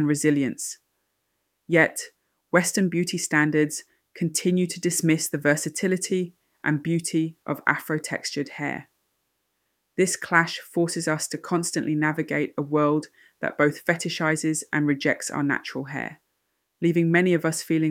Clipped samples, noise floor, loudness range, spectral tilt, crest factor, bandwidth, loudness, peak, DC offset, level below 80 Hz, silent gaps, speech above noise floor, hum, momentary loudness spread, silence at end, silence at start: under 0.1%; -75 dBFS; 3 LU; -4.5 dB/octave; 22 dB; 16.5 kHz; -24 LUFS; -2 dBFS; under 0.1%; -70 dBFS; none; 51 dB; none; 10 LU; 0 s; 0 s